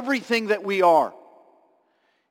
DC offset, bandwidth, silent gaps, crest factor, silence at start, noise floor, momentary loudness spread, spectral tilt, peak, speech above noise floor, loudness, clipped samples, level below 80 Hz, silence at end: under 0.1%; 17 kHz; none; 16 dB; 0 s; -67 dBFS; 6 LU; -4.5 dB/octave; -8 dBFS; 46 dB; -21 LUFS; under 0.1%; -78 dBFS; 1.2 s